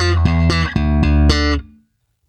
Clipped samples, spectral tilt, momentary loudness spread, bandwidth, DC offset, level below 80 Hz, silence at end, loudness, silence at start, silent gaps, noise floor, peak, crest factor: under 0.1%; -6 dB/octave; 4 LU; 8.8 kHz; under 0.1%; -20 dBFS; 0.65 s; -16 LUFS; 0 s; none; -60 dBFS; 0 dBFS; 16 dB